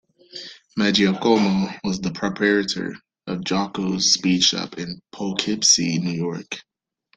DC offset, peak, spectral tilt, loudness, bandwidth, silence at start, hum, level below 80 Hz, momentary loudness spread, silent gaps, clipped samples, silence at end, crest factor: under 0.1%; 0 dBFS; -3 dB/octave; -20 LUFS; 9.4 kHz; 0.35 s; none; -58 dBFS; 17 LU; none; under 0.1%; 0.55 s; 22 dB